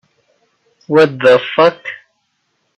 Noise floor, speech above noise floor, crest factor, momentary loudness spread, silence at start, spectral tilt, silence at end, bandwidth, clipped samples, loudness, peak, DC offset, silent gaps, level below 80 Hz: -66 dBFS; 55 dB; 16 dB; 18 LU; 0.9 s; -6 dB/octave; 0.85 s; 8.4 kHz; under 0.1%; -12 LUFS; 0 dBFS; under 0.1%; none; -60 dBFS